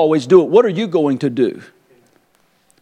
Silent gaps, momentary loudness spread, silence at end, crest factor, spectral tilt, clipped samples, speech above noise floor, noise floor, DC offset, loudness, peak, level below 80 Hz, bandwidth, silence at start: none; 9 LU; 1.2 s; 16 dB; -7 dB/octave; under 0.1%; 45 dB; -58 dBFS; under 0.1%; -14 LUFS; 0 dBFS; -68 dBFS; 9.4 kHz; 0 s